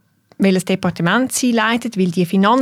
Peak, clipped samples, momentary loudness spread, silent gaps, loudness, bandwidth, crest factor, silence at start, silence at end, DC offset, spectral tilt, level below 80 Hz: -2 dBFS; under 0.1%; 3 LU; none; -17 LUFS; 15.5 kHz; 14 dB; 0.4 s; 0 s; under 0.1%; -5 dB/octave; -58 dBFS